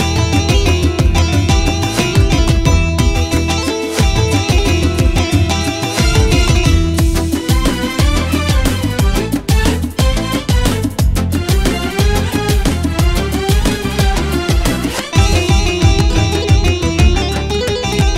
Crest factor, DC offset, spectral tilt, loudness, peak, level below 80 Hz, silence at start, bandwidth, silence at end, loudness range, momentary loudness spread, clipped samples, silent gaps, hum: 12 dB; under 0.1%; -5 dB/octave; -14 LUFS; 0 dBFS; -16 dBFS; 0 s; 16.5 kHz; 0 s; 2 LU; 4 LU; under 0.1%; none; none